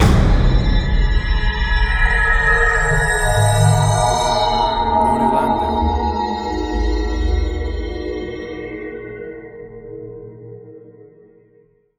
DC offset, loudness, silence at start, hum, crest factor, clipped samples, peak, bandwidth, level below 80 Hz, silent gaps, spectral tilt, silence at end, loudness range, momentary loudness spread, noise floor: under 0.1%; -17 LUFS; 0 s; none; 16 dB; under 0.1%; -2 dBFS; 15 kHz; -20 dBFS; none; -5 dB/octave; 1.2 s; 15 LU; 19 LU; -54 dBFS